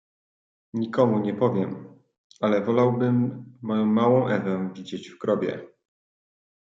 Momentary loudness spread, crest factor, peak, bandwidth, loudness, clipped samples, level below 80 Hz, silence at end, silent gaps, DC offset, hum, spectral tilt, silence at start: 14 LU; 18 dB; -8 dBFS; 7.6 kHz; -24 LUFS; under 0.1%; -72 dBFS; 1.05 s; 2.18-2.30 s; under 0.1%; none; -8.5 dB/octave; 0.75 s